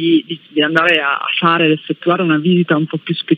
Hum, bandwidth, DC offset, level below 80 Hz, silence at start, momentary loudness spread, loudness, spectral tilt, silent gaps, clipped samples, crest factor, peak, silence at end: none; 6.8 kHz; under 0.1%; -74 dBFS; 0 s; 6 LU; -14 LUFS; -7.5 dB/octave; none; under 0.1%; 14 dB; 0 dBFS; 0 s